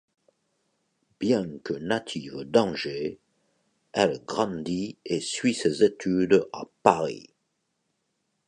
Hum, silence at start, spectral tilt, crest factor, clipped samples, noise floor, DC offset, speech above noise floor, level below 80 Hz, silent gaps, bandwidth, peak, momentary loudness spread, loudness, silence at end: none; 1.2 s; -5 dB/octave; 26 dB; under 0.1%; -77 dBFS; under 0.1%; 51 dB; -64 dBFS; none; 10.5 kHz; -2 dBFS; 11 LU; -26 LUFS; 1.3 s